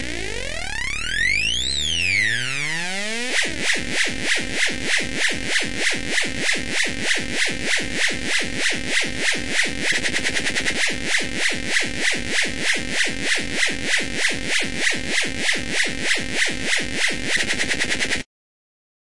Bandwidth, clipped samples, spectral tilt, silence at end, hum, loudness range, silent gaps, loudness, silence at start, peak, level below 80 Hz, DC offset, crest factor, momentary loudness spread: 11.5 kHz; under 0.1%; -1.5 dB/octave; 0.9 s; none; 1 LU; none; -21 LUFS; 0 s; -4 dBFS; -42 dBFS; 4%; 18 dB; 3 LU